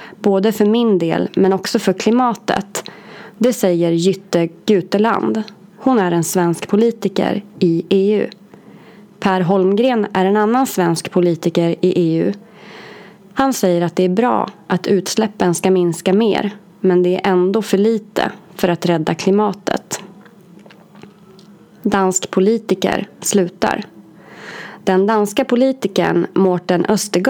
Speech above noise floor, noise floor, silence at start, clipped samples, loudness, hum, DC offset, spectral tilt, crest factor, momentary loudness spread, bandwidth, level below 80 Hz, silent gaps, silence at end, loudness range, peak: 28 dB; -43 dBFS; 0 s; under 0.1%; -16 LUFS; none; under 0.1%; -5.5 dB/octave; 16 dB; 8 LU; 19.5 kHz; -56 dBFS; none; 0 s; 4 LU; 0 dBFS